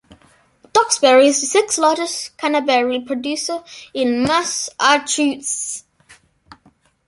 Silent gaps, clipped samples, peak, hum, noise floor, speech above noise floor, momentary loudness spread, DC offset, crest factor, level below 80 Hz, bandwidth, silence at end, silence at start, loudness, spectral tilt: none; under 0.1%; -2 dBFS; none; -56 dBFS; 39 dB; 11 LU; under 0.1%; 18 dB; -58 dBFS; 11.5 kHz; 1.25 s; 0.75 s; -17 LUFS; -1.5 dB/octave